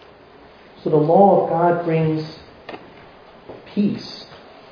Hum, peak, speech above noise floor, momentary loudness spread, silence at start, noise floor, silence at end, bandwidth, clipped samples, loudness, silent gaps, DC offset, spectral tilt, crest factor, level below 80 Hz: none; 0 dBFS; 29 dB; 25 LU; 0.85 s; -46 dBFS; 0.35 s; 5.4 kHz; under 0.1%; -18 LUFS; none; under 0.1%; -9 dB/octave; 20 dB; -60 dBFS